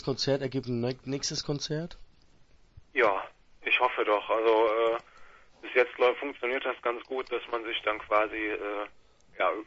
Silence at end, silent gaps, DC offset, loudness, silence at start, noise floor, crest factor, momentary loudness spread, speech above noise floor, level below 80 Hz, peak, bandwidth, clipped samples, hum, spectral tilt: 0.05 s; none; under 0.1%; -29 LUFS; 0 s; -58 dBFS; 18 dB; 11 LU; 29 dB; -60 dBFS; -10 dBFS; 8 kHz; under 0.1%; none; -4.5 dB/octave